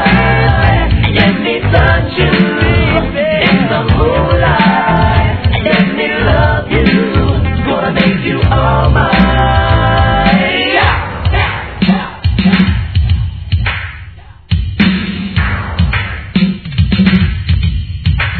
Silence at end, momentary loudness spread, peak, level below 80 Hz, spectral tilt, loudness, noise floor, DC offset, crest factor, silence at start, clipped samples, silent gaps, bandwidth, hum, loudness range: 0 s; 6 LU; 0 dBFS; -18 dBFS; -9.5 dB/octave; -11 LUFS; -32 dBFS; under 0.1%; 10 dB; 0 s; 0.2%; none; 5.4 kHz; none; 4 LU